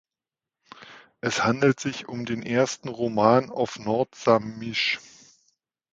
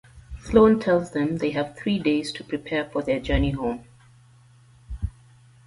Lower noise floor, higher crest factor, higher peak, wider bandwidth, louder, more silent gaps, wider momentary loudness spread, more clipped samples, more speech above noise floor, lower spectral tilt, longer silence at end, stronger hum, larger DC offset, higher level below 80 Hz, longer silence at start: first, under -90 dBFS vs -53 dBFS; about the same, 22 dB vs 20 dB; about the same, -4 dBFS vs -4 dBFS; second, 9.4 kHz vs 11.5 kHz; about the same, -25 LUFS vs -24 LUFS; neither; second, 11 LU vs 18 LU; neither; first, over 66 dB vs 31 dB; second, -5 dB/octave vs -7 dB/octave; first, 0.95 s vs 0.55 s; neither; neither; second, -64 dBFS vs -38 dBFS; first, 0.8 s vs 0.15 s